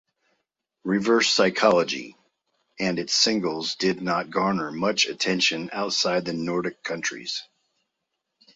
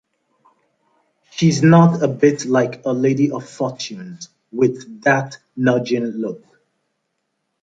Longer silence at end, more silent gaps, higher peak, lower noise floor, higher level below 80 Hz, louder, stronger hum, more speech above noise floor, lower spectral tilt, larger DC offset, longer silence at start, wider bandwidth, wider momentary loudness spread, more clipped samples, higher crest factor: second, 1.1 s vs 1.25 s; neither; about the same, -4 dBFS vs -2 dBFS; first, -80 dBFS vs -73 dBFS; second, -66 dBFS vs -60 dBFS; second, -23 LUFS vs -18 LUFS; neither; about the same, 56 dB vs 56 dB; second, -3 dB/octave vs -6.5 dB/octave; neither; second, 0.85 s vs 1.35 s; about the same, 8 kHz vs 7.8 kHz; second, 10 LU vs 19 LU; neither; about the same, 20 dB vs 18 dB